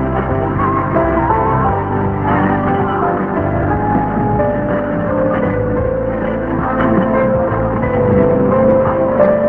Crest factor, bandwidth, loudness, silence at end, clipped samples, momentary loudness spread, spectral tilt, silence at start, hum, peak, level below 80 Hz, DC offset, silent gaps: 14 dB; 3.8 kHz; -15 LUFS; 0 s; under 0.1%; 5 LU; -11 dB/octave; 0 s; none; 0 dBFS; -28 dBFS; under 0.1%; none